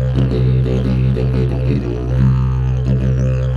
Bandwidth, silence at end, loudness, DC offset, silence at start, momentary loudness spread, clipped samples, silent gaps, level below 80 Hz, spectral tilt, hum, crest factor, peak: 6.2 kHz; 0 s; -16 LUFS; under 0.1%; 0 s; 3 LU; under 0.1%; none; -22 dBFS; -9.5 dB/octave; none; 12 dB; -2 dBFS